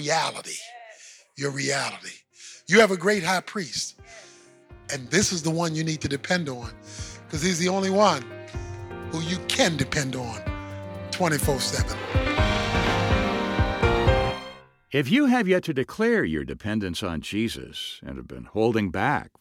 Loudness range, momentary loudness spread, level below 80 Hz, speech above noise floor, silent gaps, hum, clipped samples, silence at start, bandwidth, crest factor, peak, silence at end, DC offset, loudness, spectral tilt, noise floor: 4 LU; 17 LU; -38 dBFS; 26 dB; none; none; under 0.1%; 0 s; 18.5 kHz; 18 dB; -6 dBFS; 0.1 s; under 0.1%; -24 LUFS; -4.5 dB/octave; -51 dBFS